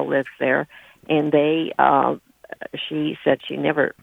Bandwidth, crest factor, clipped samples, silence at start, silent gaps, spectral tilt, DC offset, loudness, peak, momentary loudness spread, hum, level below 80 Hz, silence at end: 4 kHz; 20 dB; under 0.1%; 0 s; none; -7.5 dB/octave; under 0.1%; -21 LUFS; -2 dBFS; 16 LU; none; -64 dBFS; 0.1 s